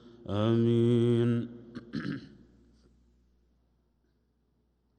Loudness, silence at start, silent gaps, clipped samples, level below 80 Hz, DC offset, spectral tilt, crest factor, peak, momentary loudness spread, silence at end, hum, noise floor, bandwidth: -28 LUFS; 0.3 s; none; under 0.1%; -66 dBFS; under 0.1%; -9 dB/octave; 16 dB; -16 dBFS; 17 LU; 2.75 s; 60 Hz at -55 dBFS; -73 dBFS; 8.8 kHz